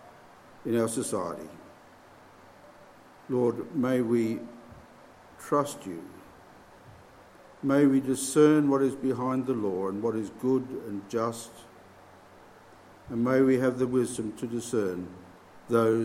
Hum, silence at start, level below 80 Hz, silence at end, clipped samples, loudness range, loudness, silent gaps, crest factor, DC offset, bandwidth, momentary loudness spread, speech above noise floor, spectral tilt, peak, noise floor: none; 0.05 s; -66 dBFS; 0 s; under 0.1%; 8 LU; -28 LUFS; none; 20 dB; under 0.1%; 16 kHz; 18 LU; 27 dB; -6 dB/octave; -10 dBFS; -53 dBFS